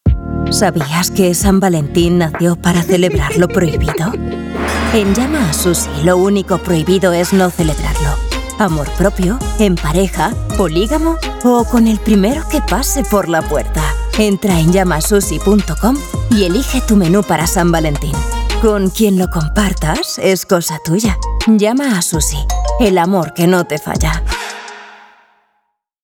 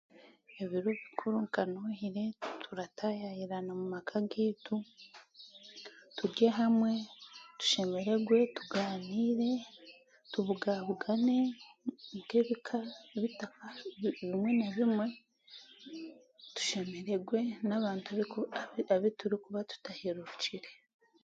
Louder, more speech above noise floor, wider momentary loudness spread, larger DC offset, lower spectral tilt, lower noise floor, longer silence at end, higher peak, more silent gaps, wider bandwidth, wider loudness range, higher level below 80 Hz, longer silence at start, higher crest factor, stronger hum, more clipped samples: first, -14 LUFS vs -35 LUFS; first, 54 dB vs 25 dB; second, 6 LU vs 20 LU; neither; about the same, -5 dB/octave vs -5 dB/octave; first, -66 dBFS vs -59 dBFS; first, 1.1 s vs 0.5 s; first, 0 dBFS vs -14 dBFS; neither; first, 18 kHz vs 7.8 kHz; second, 2 LU vs 6 LU; first, -22 dBFS vs -80 dBFS; second, 0.05 s vs 0.2 s; second, 12 dB vs 20 dB; neither; neither